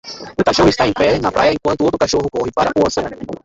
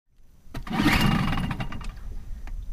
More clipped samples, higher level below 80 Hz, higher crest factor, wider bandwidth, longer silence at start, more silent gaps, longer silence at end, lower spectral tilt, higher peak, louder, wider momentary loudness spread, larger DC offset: neither; about the same, -38 dBFS vs -34 dBFS; about the same, 14 dB vs 18 dB; second, 8.2 kHz vs 15.5 kHz; second, 0.05 s vs 0.25 s; neither; about the same, 0.1 s vs 0 s; about the same, -5 dB/octave vs -5.5 dB/octave; first, -2 dBFS vs -8 dBFS; first, -15 LUFS vs -25 LUFS; second, 7 LU vs 20 LU; neither